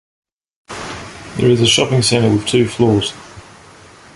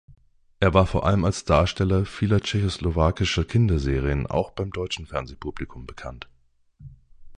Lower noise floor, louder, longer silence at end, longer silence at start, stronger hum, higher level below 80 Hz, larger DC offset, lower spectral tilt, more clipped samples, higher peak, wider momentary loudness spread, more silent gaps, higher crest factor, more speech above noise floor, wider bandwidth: second, -41 dBFS vs -58 dBFS; first, -14 LUFS vs -23 LUFS; first, 0.75 s vs 0 s; about the same, 0.7 s vs 0.6 s; neither; second, -44 dBFS vs -34 dBFS; neither; second, -4.5 dB/octave vs -6.5 dB/octave; neither; first, 0 dBFS vs -4 dBFS; about the same, 18 LU vs 17 LU; neither; about the same, 16 dB vs 20 dB; second, 28 dB vs 36 dB; first, 11.5 kHz vs 10 kHz